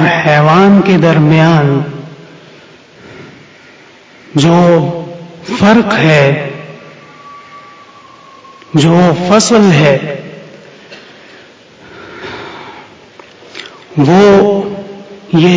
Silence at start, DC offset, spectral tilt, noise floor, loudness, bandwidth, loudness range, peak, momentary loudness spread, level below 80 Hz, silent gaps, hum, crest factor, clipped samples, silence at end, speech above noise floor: 0 s; under 0.1%; -6 dB/octave; -39 dBFS; -8 LUFS; 8 kHz; 9 LU; 0 dBFS; 22 LU; -48 dBFS; none; none; 12 dB; 0.6%; 0 s; 32 dB